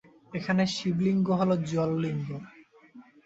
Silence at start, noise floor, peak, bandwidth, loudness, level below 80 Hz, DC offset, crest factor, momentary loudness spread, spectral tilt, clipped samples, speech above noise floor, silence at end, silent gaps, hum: 0.3 s; -53 dBFS; -14 dBFS; 8 kHz; -28 LUFS; -64 dBFS; under 0.1%; 16 dB; 12 LU; -6.5 dB/octave; under 0.1%; 26 dB; 0.25 s; none; none